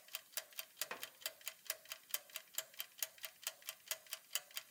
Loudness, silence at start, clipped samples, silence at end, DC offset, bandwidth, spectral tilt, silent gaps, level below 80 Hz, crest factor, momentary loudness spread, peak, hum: -46 LUFS; 0 s; under 0.1%; 0 s; under 0.1%; 18 kHz; 2.5 dB/octave; none; under -90 dBFS; 32 dB; 3 LU; -18 dBFS; none